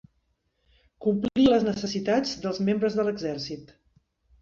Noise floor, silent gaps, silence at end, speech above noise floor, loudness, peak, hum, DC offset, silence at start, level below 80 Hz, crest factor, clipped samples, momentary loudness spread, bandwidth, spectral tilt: -73 dBFS; none; 0.75 s; 48 dB; -26 LUFS; -8 dBFS; none; under 0.1%; 1 s; -58 dBFS; 20 dB; under 0.1%; 11 LU; 7.6 kHz; -6 dB/octave